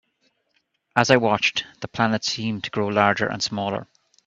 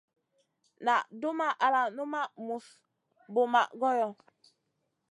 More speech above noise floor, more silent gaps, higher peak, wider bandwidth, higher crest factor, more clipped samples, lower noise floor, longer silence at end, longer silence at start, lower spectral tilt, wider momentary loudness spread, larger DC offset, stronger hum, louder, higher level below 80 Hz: about the same, 48 dB vs 51 dB; neither; first, 0 dBFS vs -12 dBFS; second, 8.2 kHz vs 11.5 kHz; about the same, 24 dB vs 20 dB; neither; second, -70 dBFS vs -80 dBFS; second, 0.4 s vs 0.95 s; first, 0.95 s vs 0.8 s; about the same, -4 dB/octave vs -4 dB/octave; about the same, 11 LU vs 9 LU; neither; neither; first, -22 LUFS vs -30 LUFS; first, -60 dBFS vs under -90 dBFS